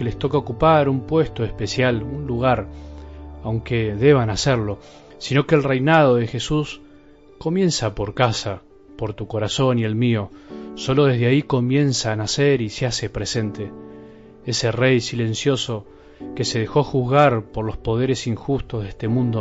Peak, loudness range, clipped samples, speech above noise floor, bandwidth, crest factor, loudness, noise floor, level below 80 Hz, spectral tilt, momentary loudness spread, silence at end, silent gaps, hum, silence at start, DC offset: -2 dBFS; 4 LU; under 0.1%; 27 dB; 8 kHz; 18 dB; -20 LUFS; -47 dBFS; -42 dBFS; -5.5 dB/octave; 17 LU; 0 s; none; none; 0 s; under 0.1%